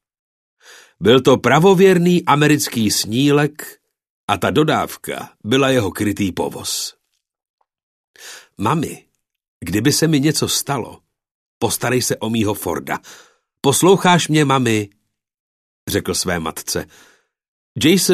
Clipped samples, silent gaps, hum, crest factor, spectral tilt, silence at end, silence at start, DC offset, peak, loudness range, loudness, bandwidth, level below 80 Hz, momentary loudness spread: under 0.1%; 4.10-4.28 s, 7.49-7.58 s, 7.83-8.14 s, 9.48-9.60 s, 11.31-11.61 s, 15.40-15.87 s, 17.48-17.75 s; none; 18 dB; -4.5 dB/octave; 0 s; 1 s; under 0.1%; 0 dBFS; 9 LU; -16 LUFS; 14 kHz; -52 dBFS; 16 LU